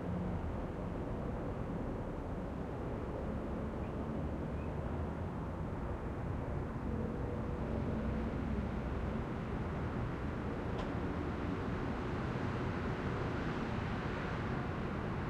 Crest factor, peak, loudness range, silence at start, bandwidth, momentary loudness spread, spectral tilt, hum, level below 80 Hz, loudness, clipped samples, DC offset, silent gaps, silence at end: 14 dB; -24 dBFS; 2 LU; 0 s; 11 kHz; 3 LU; -8.5 dB/octave; none; -46 dBFS; -40 LUFS; under 0.1%; under 0.1%; none; 0 s